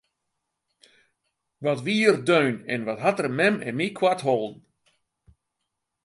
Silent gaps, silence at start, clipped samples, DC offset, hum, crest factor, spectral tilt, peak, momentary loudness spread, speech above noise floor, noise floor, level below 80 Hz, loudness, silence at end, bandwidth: none; 1.6 s; under 0.1%; under 0.1%; none; 22 dB; -5.5 dB/octave; -4 dBFS; 8 LU; 58 dB; -81 dBFS; -70 dBFS; -24 LUFS; 1.5 s; 11.5 kHz